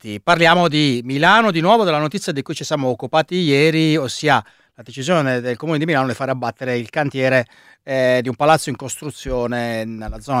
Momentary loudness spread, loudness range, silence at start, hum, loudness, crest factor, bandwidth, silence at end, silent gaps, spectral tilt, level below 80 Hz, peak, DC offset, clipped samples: 12 LU; 4 LU; 0.05 s; none; -17 LUFS; 18 dB; 15.5 kHz; 0 s; none; -5 dB/octave; -44 dBFS; 0 dBFS; under 0.1%; under 0.1%